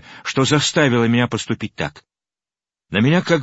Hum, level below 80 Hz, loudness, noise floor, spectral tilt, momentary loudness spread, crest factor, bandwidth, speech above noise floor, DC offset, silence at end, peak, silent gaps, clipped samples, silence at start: none; -54 dBFS; -18 LUFS; under -90 dBFS; -5 dB/octave; 11 LU; 18 dB; 8 kHz; over 73 dB; under 0.1%; 0 s; 0 dBFS; none; under 0.1%; 0.1 s